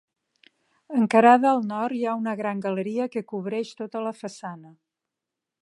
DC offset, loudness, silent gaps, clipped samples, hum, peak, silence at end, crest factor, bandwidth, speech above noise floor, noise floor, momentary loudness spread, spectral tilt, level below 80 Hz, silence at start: under 0.1%; -24 LUFS; none; under 0.1%; none; -2 dBFS; 0.95 s; 22 dB; 11.5 kHz; 63 dB; -86 dBFS; 19 LU; -6.5 dB/octave; -80 dBFS; 0.9 s